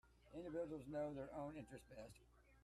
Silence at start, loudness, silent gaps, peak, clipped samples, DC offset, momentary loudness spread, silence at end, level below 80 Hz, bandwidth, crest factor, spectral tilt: 0.05 s; -52 LUFS; none; -38 dBFS; under 0.1%; under 0.1%; 12 LU; 0 s; -72 dBFS; 13.5 kHz; 14 dB; -7 dB/octave